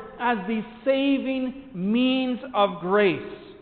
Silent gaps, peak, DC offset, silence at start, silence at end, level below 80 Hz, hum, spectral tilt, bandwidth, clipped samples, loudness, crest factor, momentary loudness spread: none; -8 dBFS; under 0.1%; 0 s; 0.05 s; -60 dBFS; none; -3.5 dB/octave; 4.6 kHz; under 0.1%; -24 LUFS; 16 dB; 9 LU